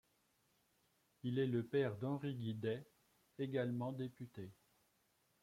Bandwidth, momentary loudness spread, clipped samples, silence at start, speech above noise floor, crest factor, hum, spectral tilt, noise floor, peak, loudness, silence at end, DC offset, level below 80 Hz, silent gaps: 15.5 kHz; 13 LU; under 0.1%; 1.25 s; 38 dB; 18 dB; none; -8.5 dB/octave; -79 dBFS; -26 dBFS; -42 LUFS; 0.9 s; under 0.1%; -82 dBFS; none